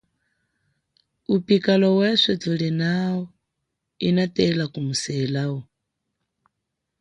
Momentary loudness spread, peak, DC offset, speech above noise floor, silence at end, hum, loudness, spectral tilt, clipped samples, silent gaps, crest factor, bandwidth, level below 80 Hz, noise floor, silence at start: 11 LU; -4 dBFS; under 0.1%; 59 dB; 1.4 s; none; -22 LUFS; -5.5 dB/octave; under 0.1%; none; 20 dB; 10.5 kHz; -62 dBFS; -80 dBFS; 1.3 s